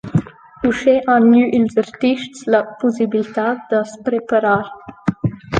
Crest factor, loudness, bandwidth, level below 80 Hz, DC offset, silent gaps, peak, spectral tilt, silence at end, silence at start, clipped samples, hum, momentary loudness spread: 14 dB; -17 LUFS; 9 kHz; -50 dBFS; under 0.1%; none; -2 dBFS; -7 dB/octave; 0 s; 0.05 s; under 0.1%; none; 10 LU